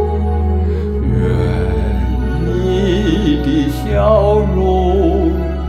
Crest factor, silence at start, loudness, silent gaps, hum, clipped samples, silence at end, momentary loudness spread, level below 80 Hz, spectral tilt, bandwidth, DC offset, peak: 14 dB; 0 s; -15 LUFS; none; none; under 0.1%; 0 s; 5 LU; -18 dBFS; -8 dB/octave; 12.5 kHz; under 0.1%; 0 dBFS